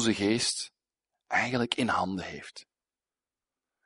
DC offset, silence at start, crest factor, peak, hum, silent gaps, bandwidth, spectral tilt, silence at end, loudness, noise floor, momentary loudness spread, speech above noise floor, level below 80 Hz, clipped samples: under 0.1%; 0 s; 22 dB; -10 dBFS; none; none; 11 kHz; -3.5 dB/octave; 1.25 s; -29 LUFS; under -90 dBFS; 16 LU; over 61 dB; -64 dBFS; under 0.1%